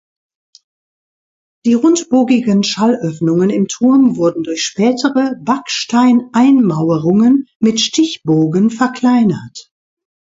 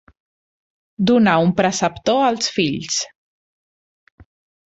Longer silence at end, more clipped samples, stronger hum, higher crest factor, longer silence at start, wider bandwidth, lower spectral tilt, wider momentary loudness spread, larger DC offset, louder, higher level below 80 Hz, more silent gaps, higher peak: second, 0.75 s vs 1.6 s; neither; neither; second, 14 dB vs 20 dB; first, 1.65 s vs 1 s; about the same, 7.8 kHz vs 8.2 kHz; about the same, -5.5 dB/octave vs -4.5 dB/octave; about the same, 6 LU vs 8 LU; neither; first, -13 LUFS vs -18 LUFS; about the same, -58 dBFS vs -54 dBFS; first, 7.55-7.60 s vs none; about the same, 0 dBFS vs -2 dBFS